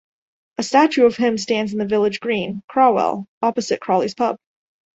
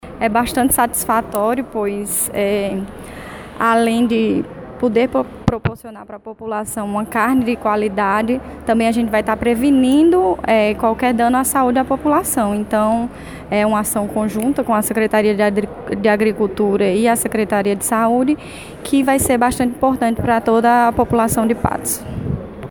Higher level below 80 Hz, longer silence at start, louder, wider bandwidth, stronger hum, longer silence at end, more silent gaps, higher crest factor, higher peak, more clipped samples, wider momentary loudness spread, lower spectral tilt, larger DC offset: second, -62 dBFS vs -40 dBFS; first, 0.6 s vs 0.05 s; about the same, -19 LUFS vs -17 LUFS; second, 8.2 kHz vs 19 kHz; neither; first, 0.6 s vs 0 s; first, 2.64-2.68 s, 3.28-3.41 s vs none; about the same, 18 dB vs 16 dB; about the same, -2 dBFS vs -2 dBFS; neither; about the same, 8 LU vs 10 LU; about the same, -5 dB/octave vs -5 dB/octave; neither